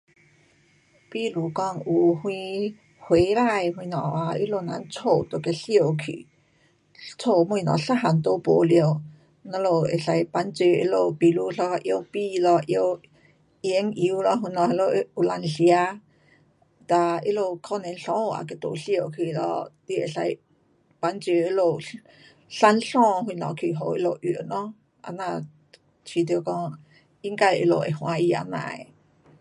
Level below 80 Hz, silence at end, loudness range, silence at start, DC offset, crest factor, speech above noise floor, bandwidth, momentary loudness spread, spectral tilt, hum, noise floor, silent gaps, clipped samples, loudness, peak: -62 dBFS; 0.55 s; 5 LU; 1.1 s; under 0.1%; 22 dB; 40 dB; 11 kHz; 12 LU; -6.5 dB/octave; none; -63 dBFS; none; under 0.1%; -24 LUFS; -2 dBFS